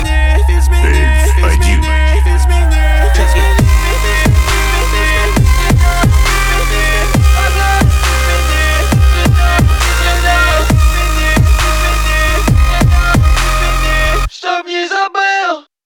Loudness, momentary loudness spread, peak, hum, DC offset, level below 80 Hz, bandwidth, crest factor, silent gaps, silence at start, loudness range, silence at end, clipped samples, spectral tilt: -11 LUFS; 3 LU; 0 dBFS; none; under 0.1%; -12 dBFS; 18.5 kHz; 10 dB; none; 0 s; 1 LU; 0.25 s; under 0.1%; -4.5 dB/octave